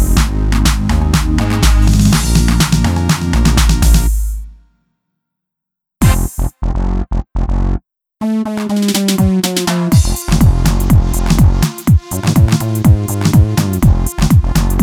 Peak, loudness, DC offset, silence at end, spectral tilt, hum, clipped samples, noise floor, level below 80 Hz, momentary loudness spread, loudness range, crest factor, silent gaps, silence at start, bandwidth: 0 dBFS; -13 LUFS; under 0.1%; 0 s; -5.5 dB/octave; none; under 0.1%; -80 dBFS; -16 dBFS; 8 LU; 7 LU; 12 dB; none; 0 s; 18 kHz